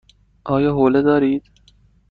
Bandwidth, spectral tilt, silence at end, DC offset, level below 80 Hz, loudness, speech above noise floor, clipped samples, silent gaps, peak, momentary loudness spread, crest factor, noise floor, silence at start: 4.9 kHz; -9.5 dB/octave; 0.7 s; under 0.1%; -48 dBFS; -17 LUFS; 38 dB; under 0.1%; none; -4 dBFS; 10 LU; 14 dB; -54 dBFS; 0.45 s